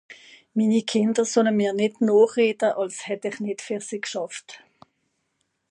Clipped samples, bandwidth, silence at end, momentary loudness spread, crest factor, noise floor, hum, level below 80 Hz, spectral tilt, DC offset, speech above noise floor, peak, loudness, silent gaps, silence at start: under 0.1%; 10.5 kHz; 1.15 s; 12 LU; 18 dB; -74 dBFS; none; -76 dBFS; -4.5 dB/octave; under 0.1%; 52 dB; -6 dBFS; -23 LUFS; none; 0.1 s